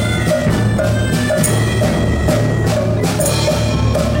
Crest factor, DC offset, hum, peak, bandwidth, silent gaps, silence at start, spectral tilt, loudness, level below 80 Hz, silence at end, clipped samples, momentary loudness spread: 12 dB; under 0.1%; none; -2 dBFS; 16.5 kHz; none; 0 s; -5.5 dB/octave; -15 LUFS; -26 dBFS; 0 s; under 0.1%; 1 LU